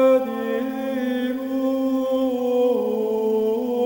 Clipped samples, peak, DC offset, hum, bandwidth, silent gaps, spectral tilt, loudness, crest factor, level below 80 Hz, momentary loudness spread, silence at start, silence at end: under 0.1%; -8 dBFS; under 0.1%; none; over 20 kHz; none; -6 dB/octave; -22 LUFS; 12 dB; -64 dBFS; 5 LU; 0 s; 0 s